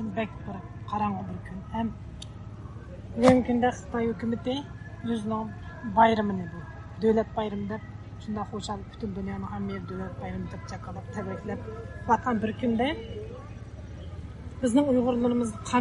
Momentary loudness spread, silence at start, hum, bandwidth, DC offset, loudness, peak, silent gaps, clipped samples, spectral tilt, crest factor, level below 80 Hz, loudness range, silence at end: 19 LU; 0 s; none; 11.5 kHz; under 0.1%; -29 LUFS; -6 dBFS; none; under 0.1%; -6.5 dB/octave; 22 dB; -48 dBFS; 8 LU; 0 s